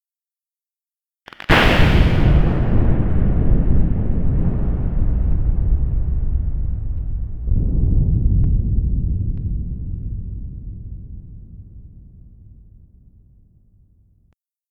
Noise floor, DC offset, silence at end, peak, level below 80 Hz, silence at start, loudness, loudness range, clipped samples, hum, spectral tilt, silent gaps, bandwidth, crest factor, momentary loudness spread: under -90 dBFS; under 0.1%; 2.15 s; 0 dBFS; -20 dBFS; 1.5 s; -20 LUFS; 16 LU; under 0.1%; none; -7.5 dB/octave; none; 7.6 kHz; 18 dB; 19 LU